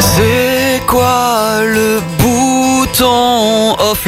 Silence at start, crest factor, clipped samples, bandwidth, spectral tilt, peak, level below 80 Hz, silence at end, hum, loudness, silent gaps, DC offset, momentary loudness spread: 0 s; 10 dB; under 0.1%; 16.5 kHz; -4 dB/octave; 0 dBFS; -30 dBFS; 0 s; none; -11 LUFS; none; under 0.1%; 3 LU